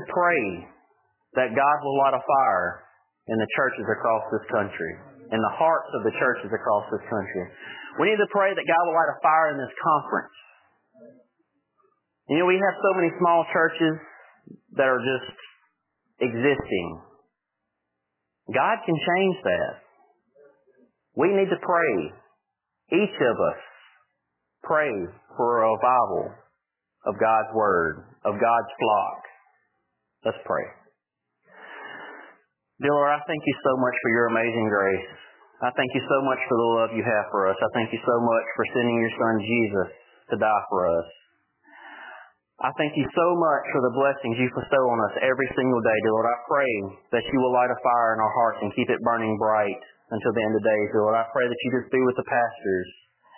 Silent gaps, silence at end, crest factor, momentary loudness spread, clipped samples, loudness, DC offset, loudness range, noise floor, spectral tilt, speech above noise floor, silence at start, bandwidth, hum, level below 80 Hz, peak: none; 0.45 s; 18 dB; 11 LU; under 0.1%; -24 LUFS; under 0.1%; 4 LU; -81 dBFS; -9.5 dB/octave; 58 dB; 0 s; 3.2 kHz; none; -62 dBFS; -8 dBFS